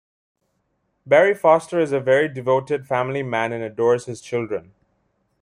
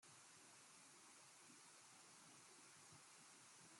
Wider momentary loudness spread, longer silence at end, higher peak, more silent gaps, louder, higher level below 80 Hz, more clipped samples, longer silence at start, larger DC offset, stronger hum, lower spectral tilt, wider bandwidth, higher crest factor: first, 10 LU vs 1 LU; first, 0.8 s vs 0 s; first, -2 dBFS vs -54 dBFS; neither; first, -20 LUFS vs -64 LUFS; first, -64 dBFS vs under -90 dBFS; neither; first, 1.05 s vs 0 s; neither; neither; first, -6 dB/octave vs -1 dB/octave; second, 11.5 kHz vs 16 kHz; about the same, 18 dB vs 14 dB